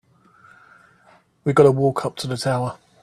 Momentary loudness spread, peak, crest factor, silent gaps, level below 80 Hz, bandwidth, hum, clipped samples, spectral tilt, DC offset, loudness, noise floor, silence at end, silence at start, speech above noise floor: 12 LU; 0 dBFS; 22 dB; none; -58 dBFS; 13.5 kHz; none; under 0.1%; -6.5 dB/octave; under 0.1%; -20 LUFS; -55 dBFS; 0.3 s; 1.45 s; 37 dB